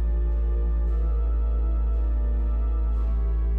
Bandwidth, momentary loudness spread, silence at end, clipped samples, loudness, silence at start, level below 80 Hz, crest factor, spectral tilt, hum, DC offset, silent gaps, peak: 2 kHz; 0 LU; 0 s; under 0.1%; -26 LUFS; 0 s; -22 dBFS; 6 dB; -11 dB/octave; none; under 0.1%; none; -18 dBFS